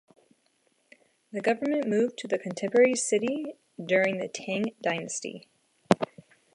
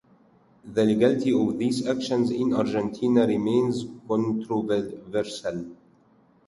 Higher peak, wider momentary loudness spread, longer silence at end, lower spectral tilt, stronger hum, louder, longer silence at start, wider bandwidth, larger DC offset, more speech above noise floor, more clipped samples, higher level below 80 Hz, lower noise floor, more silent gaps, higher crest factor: first, -2 dBFS vs -8 dBFS; first, 15 LU vs 9 LU; second, 0.5 s vs 0.75 s; second, -4.5 dB/octave vs -6.5 dB/octave; neither; second, -28 LUFS vs -25 LUFS; first, 1.35 s vs 0.65 s; about the same, 11.5 kHz vs 11.5 kHz; neither; first, 43 dB vs 36 dB; neither; second, -72 dBFS vs -62 dBFS; first, -70 dBFS vs -60 dBFS; neither; first, 26 dB vs 18 dB